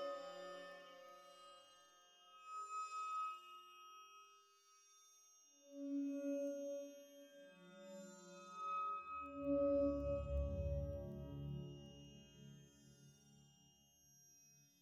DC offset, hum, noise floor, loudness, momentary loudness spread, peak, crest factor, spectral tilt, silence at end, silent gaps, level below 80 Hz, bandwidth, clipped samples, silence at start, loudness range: under 0.1%; none; -72 dBFS; -46 LUFS; 23 LU; -30 dBFS; 18 dB; -6.5 dB/octave; 0.2 s; none; -58 dBFS; 13.5 kHz; under 0.1%; 0 s; 9 LU